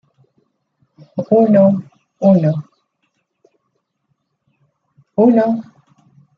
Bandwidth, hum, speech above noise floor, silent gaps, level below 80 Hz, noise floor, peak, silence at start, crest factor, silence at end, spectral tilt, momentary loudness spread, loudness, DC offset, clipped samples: 5.8 kHz; none; 58 dB; none; -64 dBFS; -70 dBFS; -2 dBFS; 1.15 s; 16 dB; 0.75 s; -11 dB/octave; 14 LU; -14 LUFS; under 0.1%; under 0.1%